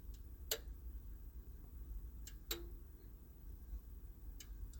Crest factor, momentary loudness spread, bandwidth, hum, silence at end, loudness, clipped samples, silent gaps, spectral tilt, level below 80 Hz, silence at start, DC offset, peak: 28 dB; 13 LU; 17 kHz; none; 0 s; -51 LUFS; under 0.1%; none; -3 dB/octave; -52 dBFS; 0 s; under 0.1%; -24 dBFS